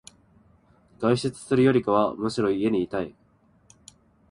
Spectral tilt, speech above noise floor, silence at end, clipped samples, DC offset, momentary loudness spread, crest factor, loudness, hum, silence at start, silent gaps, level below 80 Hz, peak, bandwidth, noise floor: -6.5 dB/octave; 38 dB; 1.2 s; under 0.1%; under 0.1%; 9 LU; 18 dB; -24 LUFS; none; 1 s; none; -58 dBFS; -8 dBFS; 11.5 kHz; -61 dBFS